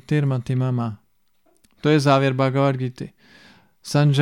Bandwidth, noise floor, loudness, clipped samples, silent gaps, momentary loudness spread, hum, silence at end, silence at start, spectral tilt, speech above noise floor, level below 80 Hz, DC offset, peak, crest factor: 12 kHz; -65 dBFS; -21 LUFS; under 0.1%; none; 15 LU; none; 0 s; 0.1 s; -7 dB/octave; 46 dB; -60 dBFS; under 0.1%; -4 dBFS; 16 dB